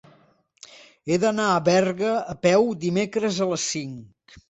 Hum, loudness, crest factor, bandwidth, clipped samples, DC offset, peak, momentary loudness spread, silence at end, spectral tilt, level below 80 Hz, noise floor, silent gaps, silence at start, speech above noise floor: none; -22 LUFS; 18 dB; 8.4 kHz; under 0.1%; under 0.1%; -6 dBFS; 11 LU; 0.1 s; -4.5 dB/octave; -62 dBFS; -60 dBFS; none; 0.75 s; 38 dB